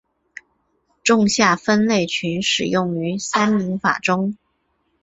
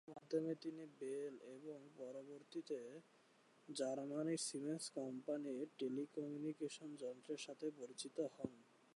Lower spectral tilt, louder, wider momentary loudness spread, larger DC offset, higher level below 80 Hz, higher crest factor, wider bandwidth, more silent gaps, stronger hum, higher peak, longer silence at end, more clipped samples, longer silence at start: about the same, -4 dB/octave vs -4.5 dB/octave; first, -19 LUFS vs -48 LUFS; second, 7 LU vs 11 LU; neither; first, -58 dBFS vs under -90 dBFS; about the same, 18 dB vs 18 dB; second, 8 kHz vs 11 kHz; neither; neither; first, -2 dBFS vs -30 dBFS; first, 0.7 s vs 0.35 s; neither; first, 1.05 s vs 0.05 s